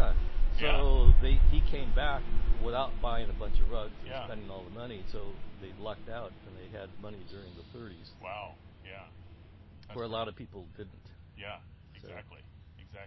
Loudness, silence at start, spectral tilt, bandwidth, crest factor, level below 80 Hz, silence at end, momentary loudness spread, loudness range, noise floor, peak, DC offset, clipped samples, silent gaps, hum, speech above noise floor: -34 LUFS; 0 s; -8.5 dB/octave; 4.9 kHz; 22 dB; -32 dBFS; 0.05 s; 24 LU; 15 LU; -53 dBFS; -4 dBFS; under 0.1%; under 0.1%; none; none; 24 dB